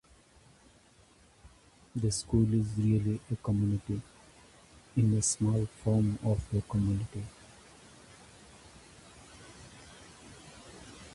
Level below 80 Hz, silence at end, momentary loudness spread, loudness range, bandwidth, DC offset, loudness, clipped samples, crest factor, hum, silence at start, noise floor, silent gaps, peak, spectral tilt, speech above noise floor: -50 dBFS; 0 s; 25 LU; 20 LU; 11.5 kHz; under 0.1%; -31 LUFS; under 0.1%; 18 dB; none; 1.45 s; -61 dBFS; none; -14 dBFS; -6 dB/octave; 32 dB